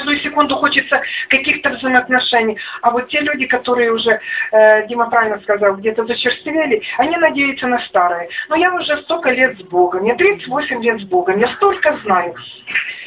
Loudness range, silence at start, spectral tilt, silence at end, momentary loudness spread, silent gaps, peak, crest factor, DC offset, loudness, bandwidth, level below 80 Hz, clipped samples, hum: 2 LU; 0 s; -7.5 dB/octave; 0 s; 5 LU; none; 0 dBFS; 14 dB; under 0.1%; -15 LUFS; 4 kHz; -54 dBFS; under 0.1%; none